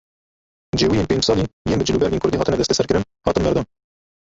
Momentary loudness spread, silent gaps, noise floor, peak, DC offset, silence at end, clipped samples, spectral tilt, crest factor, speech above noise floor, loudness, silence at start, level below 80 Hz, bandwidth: 4 LU; 1.53-1.65 s; under -90 dBFS; -2 dBFS; under 0.1%; 0.6 s; under 0.1%; -5 dB/octave; 18 dB; over 71 dB; -19 LUFS; 0.75 s; -38 dBFS; 8 kHz